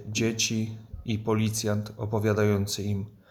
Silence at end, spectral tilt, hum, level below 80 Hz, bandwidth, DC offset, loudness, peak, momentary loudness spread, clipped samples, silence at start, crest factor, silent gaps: 0.2 s; -5 dB/octave; none; -54 dBFS; 16.5 kHz; under 0.1%; -28 LUFS; -12 dBFS; 9 LU; under 0.1%; 0 s; 14 dB; none